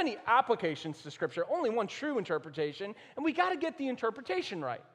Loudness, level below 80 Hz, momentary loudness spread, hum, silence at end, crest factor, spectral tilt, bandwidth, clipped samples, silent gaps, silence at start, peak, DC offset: -33 LUFS; -80 dBFS; 10 LU; none; 0.1 s; 20 dB; -5.5 dB/octave; 10.5 kHz; under 0.1%; none; 0 s; -14 dBFS; under 0.1%